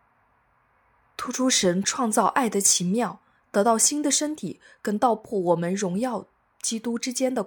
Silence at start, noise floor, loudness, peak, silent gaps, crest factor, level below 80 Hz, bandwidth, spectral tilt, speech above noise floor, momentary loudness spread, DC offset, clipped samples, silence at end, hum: 1.2 s; -65 dBFS; -23 LUFS; -6 dBFS; none; 20 dB; -68 dBFS; 19 kHz; -3 dB/octave; 41 dB; 12 LU; under 0.1%; under 0.1%; 0 s; none